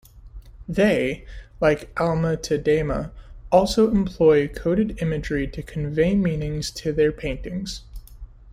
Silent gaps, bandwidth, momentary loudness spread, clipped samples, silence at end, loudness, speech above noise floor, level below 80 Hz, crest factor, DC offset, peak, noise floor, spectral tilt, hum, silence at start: none; 15 kHz; 12 LU; under 0.1%; 0 s; -22 LUFS; 20 dB; -38 dBFS; 18 dB; under 0.1%; -4 dBFS; -42 dBFS; -6.5 dB/octave; none; 0.15 s